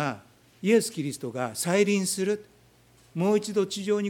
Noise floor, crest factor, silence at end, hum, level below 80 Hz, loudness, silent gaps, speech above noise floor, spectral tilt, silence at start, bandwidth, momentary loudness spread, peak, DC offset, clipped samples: -58 dBFS; 18 dB; 0 s; none; -70 dBFS; -27 LUFS; none; 33 dB; -4.5 dB/octave; 0 s; 18.5 kHz; 9 LU; -10 dBFS; under 0.1%; under 0.1%